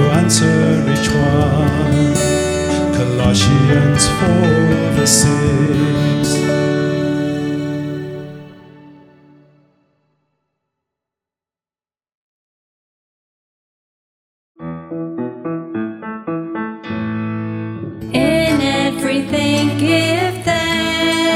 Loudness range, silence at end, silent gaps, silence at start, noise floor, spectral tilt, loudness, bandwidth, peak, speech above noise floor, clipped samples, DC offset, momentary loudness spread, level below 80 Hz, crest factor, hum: 15 LU; 0 s; 12.14-14.55 s; 0 s; under -90 dBFS; -5 dB/octave; -15 LUFS; 16.5 kHz; 0 dBFS; over 78 dB; under 0.1%; under 0.1%; 13 LU; -40 dBFS; 16 dB; none